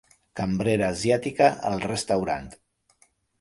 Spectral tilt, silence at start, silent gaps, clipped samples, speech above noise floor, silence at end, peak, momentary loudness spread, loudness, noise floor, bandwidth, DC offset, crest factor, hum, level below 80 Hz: -5.5 dB/octave; 0.35 s; none; under 0.1%; 40 dB; 0.85 s; -6 dBFS; 11 LU; -25 LUFS; -64 dBFS; 11.5 kHz; under 0.1%; 20 dB; none; -52 dBFS